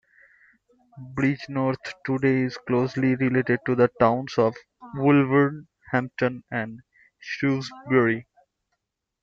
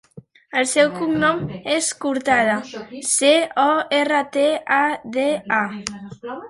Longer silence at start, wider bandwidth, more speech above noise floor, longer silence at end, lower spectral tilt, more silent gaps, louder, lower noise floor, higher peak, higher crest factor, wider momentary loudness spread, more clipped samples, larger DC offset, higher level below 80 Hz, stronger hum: first, 0.95 s vs 0.15 s; second, 7.4 kHz vs 11.5 kHz; first, 56 dB vs 23 dB; first, 1 s vs 0 s; first, -8 dB/octave vs -3 dB/octave; neither; second, -24 LUFS vs -19 LUFS; first, -79 dBFS vs -42 dBFS; second, -4 dBFS vs 0 dBFS; about the same, 20 dB vs 20 dB; about the same, 12 LU vs 10 LU; neither; neither; about the same, -62 dBFS vs -58 dBFS; neither